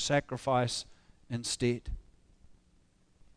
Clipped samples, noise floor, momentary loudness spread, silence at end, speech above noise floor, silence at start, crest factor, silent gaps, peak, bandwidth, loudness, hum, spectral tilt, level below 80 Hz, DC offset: under 0.1%; -66 dBFS; 17 LU; 0.85 s; 34 dB; 0 s; 20 dB; none; -16 dBFS; 11 kHz; -33 LUFS; none; -4.5 dB/octave; -50 dBFS; under 0.1%